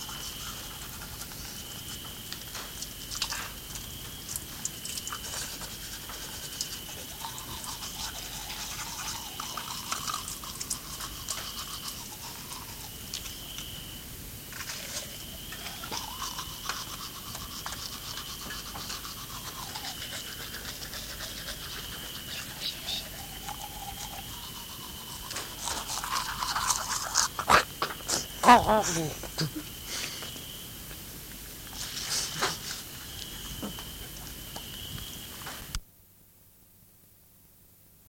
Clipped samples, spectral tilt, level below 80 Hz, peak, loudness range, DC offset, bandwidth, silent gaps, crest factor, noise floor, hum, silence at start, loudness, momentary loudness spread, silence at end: under 0.1%; -2 dB/octave; -50 dBFS; -4 dBFS; 12 LU; under 0.1%; 17 kHz; none; 32 dB; -58 dBFS; none; 0 s; -33 LUFS; 11 LU; 0.05 s